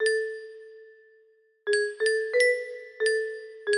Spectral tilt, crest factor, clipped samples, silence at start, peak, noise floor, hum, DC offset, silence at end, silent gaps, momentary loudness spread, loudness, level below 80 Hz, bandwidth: 0.5 dB/octave; 18 dB; under 0.1%; 0 s; -12 dBFS; -62 dBFS; none; under 0.1%; 0 s; none; 17 LU; -27 LUFS; -76 dBFS; 11 kHz